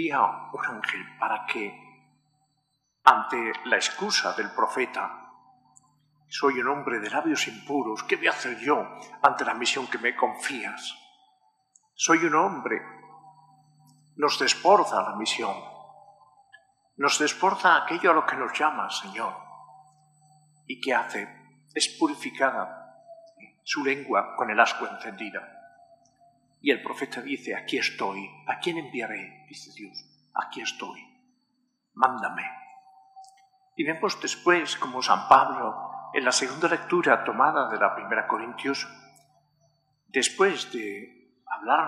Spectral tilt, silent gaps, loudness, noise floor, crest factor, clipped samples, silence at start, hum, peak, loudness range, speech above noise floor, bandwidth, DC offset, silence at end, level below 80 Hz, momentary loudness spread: -2 dB/octave; none; -26 LUFS; -75 dBFS; 26 dB; under 0.1%; 0 s; none; -2 dBFS; 8 LU; 49 dB; 14 kHz; under 0.1%; 0 s; -78 dBFS; 16 LU